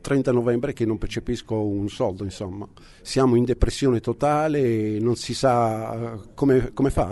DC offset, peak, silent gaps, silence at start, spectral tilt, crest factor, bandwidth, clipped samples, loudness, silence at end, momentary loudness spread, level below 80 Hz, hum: under 0.1%; -4 dBFS; none; 0.05 s; -6.5 dB/octave; 18 dB; 11.5 kHz; under 0.1%; -23 LUFS; 0 s; 11 LU; -36 dBFS; none